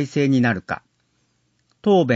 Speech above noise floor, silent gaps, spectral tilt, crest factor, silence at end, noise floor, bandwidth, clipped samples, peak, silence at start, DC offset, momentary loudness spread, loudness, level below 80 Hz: 48 dB; none; -7 dB/octave; 16 dB; 0 s; -67 dBFS; 8 kHz; under 0.1%; -4 dBFS; 0 s; under 0.1%; 13 LU; -21 LUFS; -60 dBFS